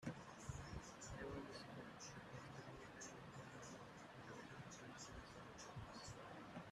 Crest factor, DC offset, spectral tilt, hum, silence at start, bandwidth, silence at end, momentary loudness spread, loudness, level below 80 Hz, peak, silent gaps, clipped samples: 20 dB; under 0.1%; -4.5 dB/octave; none; 0 s; 13.5 kHz; 0 s; 4 LU; -56 LUFS; -68 dBFS; -36 dBFS; none; under 0.1%